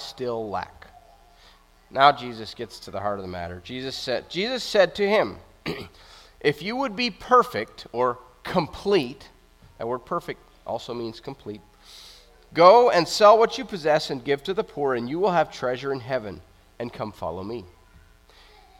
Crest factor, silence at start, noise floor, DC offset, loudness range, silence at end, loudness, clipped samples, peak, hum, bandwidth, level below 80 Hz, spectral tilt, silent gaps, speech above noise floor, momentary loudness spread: 24 dB; 0 s; -54 dBFS; under 0.1%; 10 LU; 1.15 s; -23 LUFS; under 0.1%; -2 dBFS; none; 16 kHz; -56 dBFS; -4.5 dB/octave; none; 31 dB; 20 LU